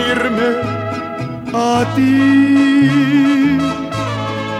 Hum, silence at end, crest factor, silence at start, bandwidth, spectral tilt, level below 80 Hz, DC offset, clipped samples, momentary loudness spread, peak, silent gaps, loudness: none; 0 s; 12 dB; 0 s; 11.5 kHz; -6 dB/octave; -46 dBFS; under 0.1%; under 0.1%; 10 LU; -2 dBFS; none; -14 LUFS